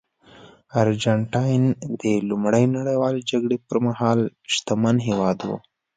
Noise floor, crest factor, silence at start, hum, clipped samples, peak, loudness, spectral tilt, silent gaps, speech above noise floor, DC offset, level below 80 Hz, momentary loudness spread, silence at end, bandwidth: -49 dBFS; 18 dB; 0.75 s; none; under 0.1%; -4 dBFS; -22 LUFS; -6 dB/octave; none; 28 dB; under 0.1%; -58 dBFS; 5 LU; 0.4 s; 9.4 kHz